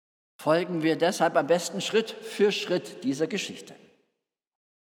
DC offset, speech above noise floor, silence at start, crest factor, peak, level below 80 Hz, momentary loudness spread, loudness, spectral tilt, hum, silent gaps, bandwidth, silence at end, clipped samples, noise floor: under 0.1%; 56 dB; 0.4 s; 18 dB; -10 dBFS; -90 dBFS; 9 LU; -27 LUFS; -4.5 dB/octave; none; none; 18 kHz; 1.1 s; under 0.1%; -82 dBFS